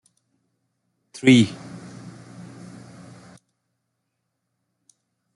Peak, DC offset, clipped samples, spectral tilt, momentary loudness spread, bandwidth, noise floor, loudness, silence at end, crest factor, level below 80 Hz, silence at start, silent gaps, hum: -2 dBFS; under 0.1%; under 0.1%; -5.5 dB/octave; 28 LU; 11.5 kHz; -78 dBFS; -18 LUFS; 3.8 s; 24 dB; -66 dBFS; 1.25 s; none; none